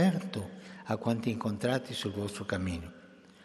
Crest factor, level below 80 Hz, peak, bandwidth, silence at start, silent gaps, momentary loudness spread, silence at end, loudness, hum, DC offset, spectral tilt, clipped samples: 18 dB; -64 dBFS; -14 dBFS; 13 kHz; 0 s; none; 13 LU; 0 s; -34 LUFS; none; under 0.1%; -6 dB/octave; under 0.1%